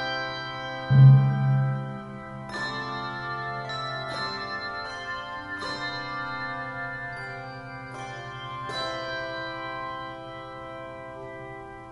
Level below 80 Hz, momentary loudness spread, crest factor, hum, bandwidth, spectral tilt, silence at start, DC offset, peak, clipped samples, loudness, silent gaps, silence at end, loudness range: -56 dBFS; 15 LU; 22 dB; none; 7.8 kHz; -7 dB/octave; 0 s; under 0.1%; -6 dBFS; under 0.1%; -27 LUFS; none; 0 s; 11 LU